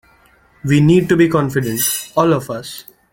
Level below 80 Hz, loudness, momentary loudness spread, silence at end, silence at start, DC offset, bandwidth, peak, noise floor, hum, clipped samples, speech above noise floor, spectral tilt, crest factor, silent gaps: -48 dBFS; -15 LUFS; 15 LU; 0.3 s; 0.65 s; under 0.1%; 17 kHz; -2 dBFS; -51 dBFS; none; under 0.1%; 37 dB; -5.5 dB/octave; 14 dB; none